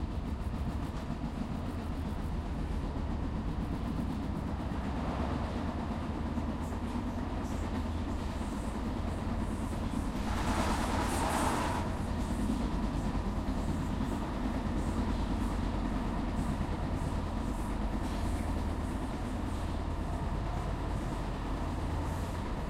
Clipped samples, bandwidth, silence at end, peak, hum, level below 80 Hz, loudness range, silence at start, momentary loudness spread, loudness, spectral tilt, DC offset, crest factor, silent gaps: under 0.1%; 15.5 kHz; 0 s; -18 dBFS; none; -38 dBFS; 3 LU; 0 s; 5 LU; -36 LUFS; -6.5 dB/octave; under 0.1%; 16 dB; none